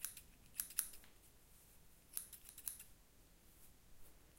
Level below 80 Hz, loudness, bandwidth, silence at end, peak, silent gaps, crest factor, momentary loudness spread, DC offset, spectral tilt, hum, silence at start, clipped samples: -70 dBFS; -47 LUFS; 16.5 kHz; 0 s; -16 dBFS; none; 38 dB; 24 LU; under 0.1%; 0 dB/octave; none; 0 s; under 0.1%